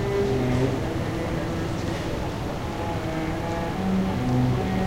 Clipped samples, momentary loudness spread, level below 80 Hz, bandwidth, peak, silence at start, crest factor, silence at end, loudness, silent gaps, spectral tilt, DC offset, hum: under 0.1%; 6 LU; -36 dBFS; 16 kHz; -8 dBFS; 0 s; 16 dB; 0 s; -26 LUFS; none; -7 dB/octave; under 0.1%; none